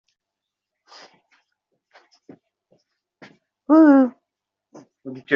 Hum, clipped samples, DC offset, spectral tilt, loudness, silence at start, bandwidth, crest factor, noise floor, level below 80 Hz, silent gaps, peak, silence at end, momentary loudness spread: none; under 0.1%; under 0.1%; -4.5 dB/octave; -15 LUFS; 3.7 s; 6 kHz; 20 dB; -84 dBFS; -72 dBFS; none; -4 dBFS; 0 s; 28 LU